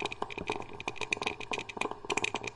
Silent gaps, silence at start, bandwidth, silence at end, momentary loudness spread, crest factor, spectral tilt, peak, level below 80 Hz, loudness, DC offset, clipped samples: none; 0 s; 11.5 kHz; 0 s; 6 LU; 24 dB; -2.5 dB/octave; -12 dBFS; -60 dBFS; -35 LUFS; under 0.1%; under 0.1%